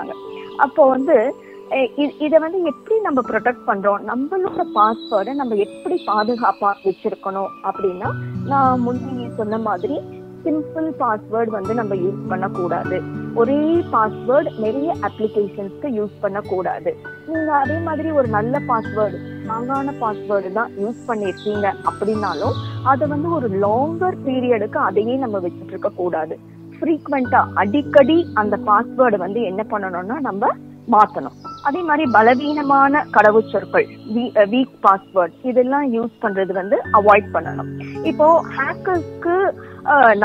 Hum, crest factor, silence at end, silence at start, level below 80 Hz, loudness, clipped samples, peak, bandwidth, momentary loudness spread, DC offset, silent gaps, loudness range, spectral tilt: none; 18 dB; 0 s; 0 s; -58 dBFS; -19 LUFS; under 0.1%; 0 dBFS; 9 kHz; 11 LU; under 0.1%; none; 6 LU; -8 dB/octave